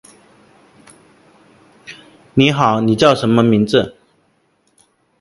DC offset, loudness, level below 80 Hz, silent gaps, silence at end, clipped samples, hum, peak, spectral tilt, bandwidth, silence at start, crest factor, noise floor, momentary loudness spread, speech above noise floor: under 0.1%; -14 LUFS; -52 dBFS; none; 1.3 s; under 0.1%; none; 0 dBFS; -6 dB/octave; 11.5 kHz; 1.9 s; 18 dB; -60 dBFS; 23 LU; 48 dB